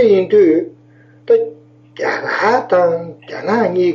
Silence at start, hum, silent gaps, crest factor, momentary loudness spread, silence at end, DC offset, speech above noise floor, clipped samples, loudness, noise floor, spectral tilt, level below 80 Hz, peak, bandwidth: 0 s; none; none; 12 dB; 14 LU; 0 s; under 0.1%; 32 dB; under 0.1%; -15 LUFS; -46 dBFS; -6.5 dB/octave; -62 dBFS; -2 dBFS; 7.2 kHz